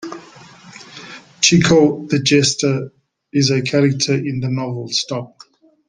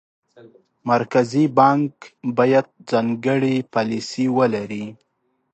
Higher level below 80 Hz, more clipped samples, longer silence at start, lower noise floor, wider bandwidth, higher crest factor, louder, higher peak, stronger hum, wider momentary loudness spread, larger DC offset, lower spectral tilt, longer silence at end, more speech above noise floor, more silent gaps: first, -50 dBFS vs -66 dBFS; neither; second, 0 s vs 0.85 s; second, -42 dBFS vs -49 dBFS; first, 10.5 kHz vs 8.8 kHz; about the same, 18 dB vs 18 dB; first, -16 LUFS vs -20 LUFS; about the same, 0 dBFS vs -2 dBFS; neither; first, 22 LU vs 13 LU; neither; second, -4.5 dB/octave vs -6.5 dB/octave; about the same, 0.6 s vs 0.6 s; second, 26 dB vs 30 dB; neither